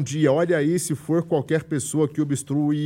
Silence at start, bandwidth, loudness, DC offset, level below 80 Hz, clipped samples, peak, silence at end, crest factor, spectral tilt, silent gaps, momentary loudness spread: 0 s; 16 kHz; -23 LUFS; under 0.1%; -62 dBFS; under 0.1%; -8 dBFS; 0 s; 14 dB; -6 dB/octave; none; 5 LU